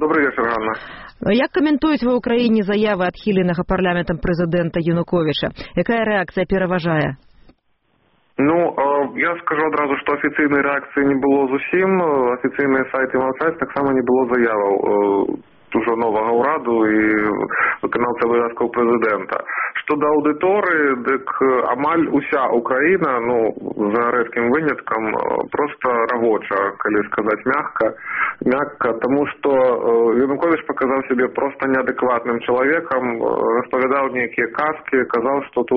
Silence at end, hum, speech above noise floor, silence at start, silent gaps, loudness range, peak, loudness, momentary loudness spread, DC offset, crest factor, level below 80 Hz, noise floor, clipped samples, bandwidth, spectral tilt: 0 s; none; 46 dB; 0 s; none; 2 LU; -4 dBFS; -18 LUFS; 5 LU; under 0.1%; 14 dB; -46 dBFS; -63 dBFS; under 0.1%; 5.8 kHz; -4.5 dB/octave